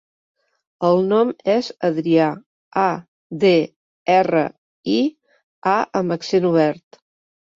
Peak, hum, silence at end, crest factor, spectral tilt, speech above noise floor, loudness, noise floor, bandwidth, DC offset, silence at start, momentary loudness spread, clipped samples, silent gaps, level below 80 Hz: -4 dBFS; none; 0.8 s; 16 dB; -6.5 dB/octave; over 72 dB; -19 LUFS; under -90 dBFS; 7.6 kHz; under 0.1%; 0.8 s; 12 LU; under 0.1%; 2.46-2.71 s, 3.08-3.30 s, 3.76-4.06 s, 4.58-4.83 s, 5.44-5.62 s; -64 dBFS